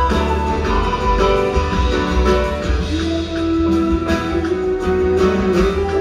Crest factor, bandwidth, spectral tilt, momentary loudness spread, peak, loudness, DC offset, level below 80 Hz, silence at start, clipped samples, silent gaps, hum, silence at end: 14 dB; 12 kHz; -6.5 dB/octave; 4 LU; -2 dBFS; -17 LUFS; under 0.1%; -22 dBFS; 0 s; under 0.1%; none; none; 0 s